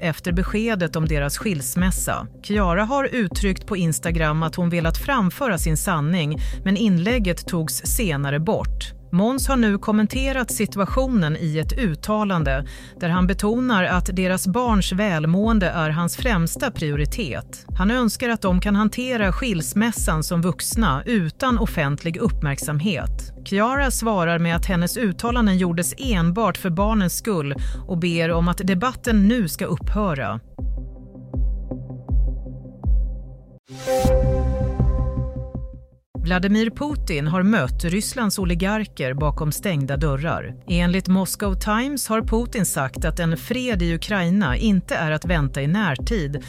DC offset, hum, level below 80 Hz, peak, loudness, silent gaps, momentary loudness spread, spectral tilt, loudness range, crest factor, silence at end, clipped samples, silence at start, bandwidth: under 0.1%; none; -28 dBFS; -6 dBFS; -22 LUFS; 33.59-33.64 s, 36.06-36.14 s; 8 LU; -5.5 dB/octave; 3 LU; 14 dB; 0 s; under 0.1%; 0 s; 16 kHz